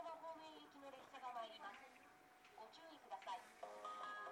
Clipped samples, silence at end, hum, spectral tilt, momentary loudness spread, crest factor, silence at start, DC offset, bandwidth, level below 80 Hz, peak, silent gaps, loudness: under 0.1%; 0 s; none; -2 dB/octave; 12 LU; 16 dB; 0 s; under 0.1%; 19 kHz; under -90 dBFS; -40 dBFS; none; -55 LUFS